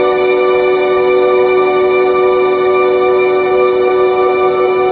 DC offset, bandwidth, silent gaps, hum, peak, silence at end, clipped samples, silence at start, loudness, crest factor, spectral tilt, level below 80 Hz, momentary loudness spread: under 0.1%; 4.7 kHz; none; none; 0 dBFS; 0 s; under 0.1%; 0 s; -11 LUFS; 10 dB; -8 dB/octave; -48 dBFS; 1 LU